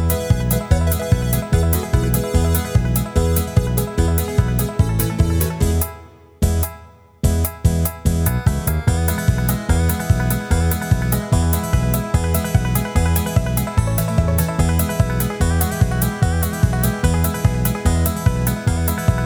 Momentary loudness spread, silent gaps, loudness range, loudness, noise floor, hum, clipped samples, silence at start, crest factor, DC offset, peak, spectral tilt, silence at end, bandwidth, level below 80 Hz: 2 LU; none; 2 LU; -19 LUFS; -42 dBFS; none; under 0.1%; 0 s; 14 dB; under 0.1%; -4 dBFS; -6 dB/octave; 0 s; over 20 kHz; -24 dBFS